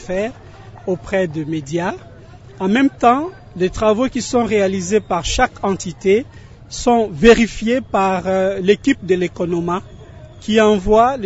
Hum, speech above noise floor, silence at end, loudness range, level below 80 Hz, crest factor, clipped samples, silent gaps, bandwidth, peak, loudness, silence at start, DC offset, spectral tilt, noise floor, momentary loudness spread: none; 23 dB; 0 s; 3 LU; -36 dBFS; 16 dB; under 0.1%; none; 8 kHz; 0 dBFS; -17 LUFS; 0 s; under 0.1%; -5 dB/octave; -39 dBFS; 12 LU